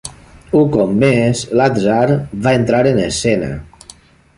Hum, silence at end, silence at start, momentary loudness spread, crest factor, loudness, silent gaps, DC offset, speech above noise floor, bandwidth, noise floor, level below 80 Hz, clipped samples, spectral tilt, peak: none; 0.75 s; 0.05 s; 6 LU; 14 dB; -14 LUFS; none; under 0.1%; 30 dB; 11.5 kHz; -43 dBFS; -40 dBFS; under 0.1%; -6 dB/octave; -2 dBFS